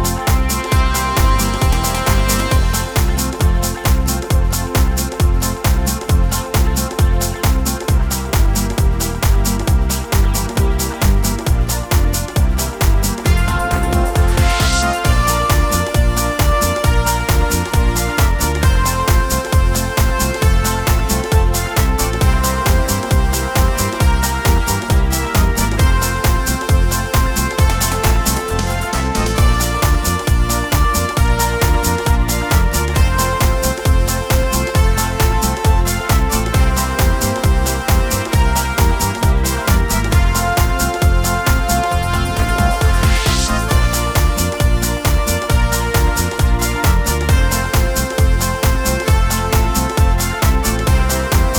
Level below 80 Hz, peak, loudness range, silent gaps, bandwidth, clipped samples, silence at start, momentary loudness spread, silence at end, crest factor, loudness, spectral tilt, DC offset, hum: -16 dBFS; 0 dBFS; 1 LU; none; over 20 kHz; under 0.1%; 0 s; 2 LU; 0 s; 14 dB; -16 LUFS; -4.5 dB/octave; under 0.1%; none